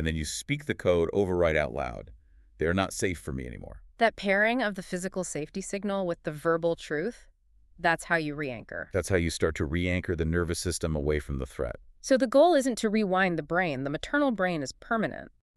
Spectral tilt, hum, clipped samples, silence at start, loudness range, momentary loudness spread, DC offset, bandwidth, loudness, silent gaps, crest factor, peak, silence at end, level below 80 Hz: -5 dB/octave; none; under 0.1%; 0 s; 4 LU; 11 LU; under 0.1%; 13.5 kHz; -28 LUFS; none; 20 dB; -8 dBFS; 0.3 s; -44 dBFS